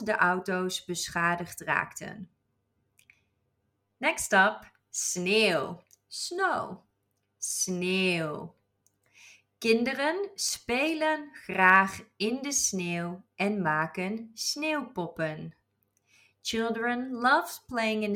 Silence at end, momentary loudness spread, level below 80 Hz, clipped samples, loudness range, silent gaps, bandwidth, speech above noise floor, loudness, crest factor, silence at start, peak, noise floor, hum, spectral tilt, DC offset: 0 s; 14 LU; -68 dBFS; under 0.1%; 6 LU; none; 18 kHz; 48 dB; -28 LUFS; 22 dB; 0 s; -8 dBFS; -77 dBFS; none; -3 dB/octave; under 0.1%